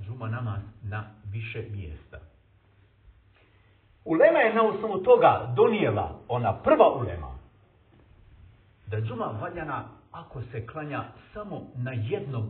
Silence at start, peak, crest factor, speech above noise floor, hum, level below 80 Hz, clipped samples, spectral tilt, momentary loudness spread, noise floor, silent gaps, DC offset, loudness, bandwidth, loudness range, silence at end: 0 s; -6 dBFS; 22 dB; 34 dB; none; -52 dBFS; under 0.1%; -5.5 dB/octave; 20 LU; -60 dBFS; none; under 0.1%; -26 LUFS; 4.3 kHz; 15 LU; 0 s